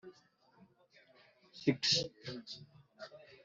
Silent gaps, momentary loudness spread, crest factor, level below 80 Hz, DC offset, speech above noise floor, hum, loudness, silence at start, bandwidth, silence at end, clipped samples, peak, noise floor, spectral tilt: none; 24 LU; 26 dB; -78 dBFS; under 0.1%; 32 dB; none; -35 LUFS; 0.05 s; 8 kHz; 0.1 s; under 0.1%; -16 dBFS; -68 dBFS; -3 dB/octave